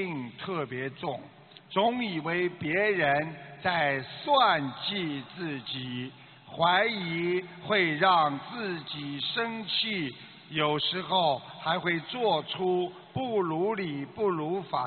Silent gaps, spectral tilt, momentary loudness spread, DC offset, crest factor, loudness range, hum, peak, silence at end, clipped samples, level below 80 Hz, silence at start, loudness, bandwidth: none; -2.5 dB/octave; 12 LU; under 0.1%; 20 dB; 2 LU; none; -10 dBFS; 0 s; under 0.1%; -68 dBFS; 0 s; -29 LUFS; 4.6 kHz